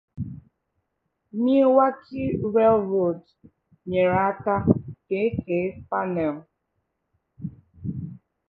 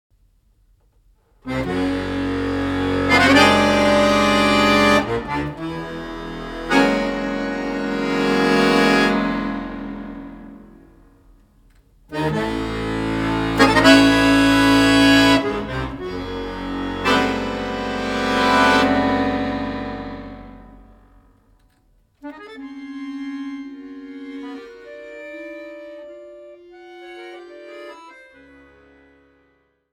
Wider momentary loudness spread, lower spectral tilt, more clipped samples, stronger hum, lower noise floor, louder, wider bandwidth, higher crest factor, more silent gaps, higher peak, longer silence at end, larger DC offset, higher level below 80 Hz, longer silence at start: second, 19 LU vs 24 LU; first, -11 dB/octave vs -4.5 dB/octave; neither; neither; first, -77 dBFS vs -63 dBFS; second, -23 LUFS vs -18 LUFS; second, 5 kHz vs 16.5 kHz; about the same, 22 dB vs 20 dB; neither; about the same, -2 dBFS vs 0 dBFS; second, 0.3 s vs 1.8 s; neither; second, -52 dBFS vs -40 dBFS; second, 0.15 s vs 1.45 s